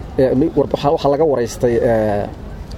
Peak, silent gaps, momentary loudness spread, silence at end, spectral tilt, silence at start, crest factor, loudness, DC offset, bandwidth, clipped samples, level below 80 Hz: -2 dBFS; none; 7 LU; 0 s; -7 dB/octave; 0 s; 14 dB; -16 LUFS; under 0.1%; 15.5 kHz; under 0.1%; -34 dBFS